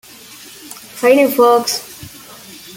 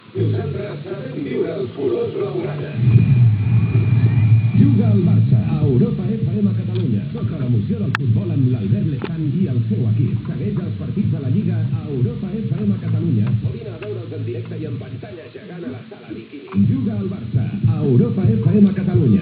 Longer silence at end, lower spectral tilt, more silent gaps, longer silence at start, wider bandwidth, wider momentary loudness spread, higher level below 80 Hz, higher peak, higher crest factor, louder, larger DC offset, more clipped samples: about the same, 0 s vs 0 s; second, -3 dB/octave vs -11.5 dB/octave; neither; first, 0.65 s vs 0.15 s; first, 17 kHz vs 4.6 kHz; first, 24 LU vs 14 LU; second, -60 dBFS vs -44 dBFS; about the same, -2 dBFS vs 0 dBFS; about the same, 16 dB vs 18 dB; first, -13 LUFS vs -19 LUFS; neither; neither